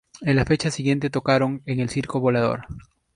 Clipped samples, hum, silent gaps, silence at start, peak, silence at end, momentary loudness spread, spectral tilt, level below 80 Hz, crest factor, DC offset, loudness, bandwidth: under 0.1%; none; none; 0.15 s; -4 dBFS; 0.35 s; 8 LU; -6 dB/octave; -46 dBFS; 18 dB; under 0.1%; -23 LUFS; 11 kHz